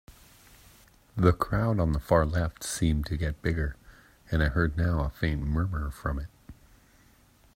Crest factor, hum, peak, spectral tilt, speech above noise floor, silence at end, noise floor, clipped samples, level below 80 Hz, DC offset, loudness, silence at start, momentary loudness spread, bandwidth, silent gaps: 22 dB; none; -6 dBFS; -6.5 dB/octave; 33 dB; 1.05 s; -60 dBFS; under 0.1%; -38 dBFS; under 0.1%; -28 LUFS; 0.1 s; 9 LU; 16 kHz; none